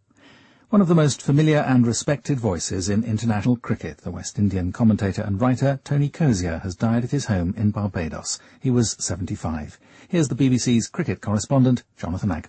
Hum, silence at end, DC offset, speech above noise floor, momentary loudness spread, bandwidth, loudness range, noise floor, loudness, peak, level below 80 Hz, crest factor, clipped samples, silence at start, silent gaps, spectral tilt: none; 0 s; under 0.1%; 31 dB; 10 LU; 8.8 kHz; 4 LU; -52 dBFS; -22 LUFS; -8 dBFS; -46 dBFS; 14 dB; under 0.1%; 0.7 s; none; -6 dB/octave